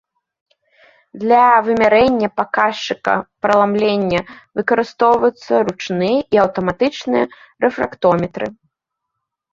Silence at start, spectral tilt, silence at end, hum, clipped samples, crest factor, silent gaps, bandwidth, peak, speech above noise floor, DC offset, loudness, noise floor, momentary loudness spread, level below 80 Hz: 1.15 s; -6 dB/octave; 1 s; none; under 0.1%; 16 dB; none; 7.6 kHz; 0 dBFS; 62 dB; under 0.1%; -16 LUFS; -78 dBFS; 9 LU; -52 dBFS